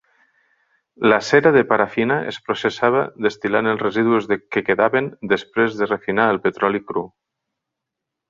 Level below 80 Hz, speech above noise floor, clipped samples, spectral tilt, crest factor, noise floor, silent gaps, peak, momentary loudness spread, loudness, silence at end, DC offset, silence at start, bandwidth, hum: -60 dBFS; 64 dB; under 0.1%; -6 dB/octave; 18 dB; -82 dBFS; none; -2 dBFS; 8 LU; -19 LUFS; 1.25 s; under 0.1%; 1 s; 7.6 kHz; none